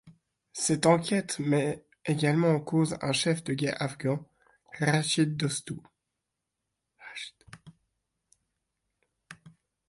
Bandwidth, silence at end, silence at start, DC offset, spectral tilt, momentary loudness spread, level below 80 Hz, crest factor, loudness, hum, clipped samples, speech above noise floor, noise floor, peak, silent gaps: 11.5 kHz; 0.4 s; 0.05 s; under 0.1%; -5 dB/octave; 17 LU; -68 dBFS; 20 dB; -28 LUFS; none; under 0.1%; 58 dB; -85 dBFS; -10 dBFS; none